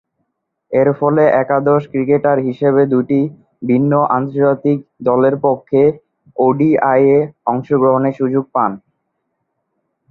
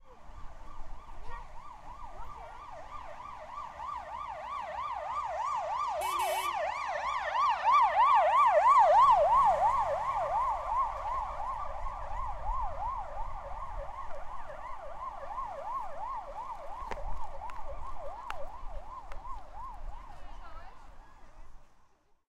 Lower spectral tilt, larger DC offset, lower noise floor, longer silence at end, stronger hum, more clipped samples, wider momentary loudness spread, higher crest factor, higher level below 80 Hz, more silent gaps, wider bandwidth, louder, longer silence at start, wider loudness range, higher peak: first, -11 dB/octave vs -3.5 dB/octave; neither; first, -71 dBFS vs -63 dBFS; first, 1.35 s vs 0.65 s; neither; neither; second, 7 LU vs 24 LU; about the same, 14 dB vs 18 dB; second, -58 dBFS vs -46 dBFS; neither; second, 4.1 kHz vs 14 kHz; first, -14 LUFS vs -30 LUFS; first, 0.7 s vs 0.05 s; second, 1 LU vs 22 LU; first, 0 dBFS vs -14 dBFS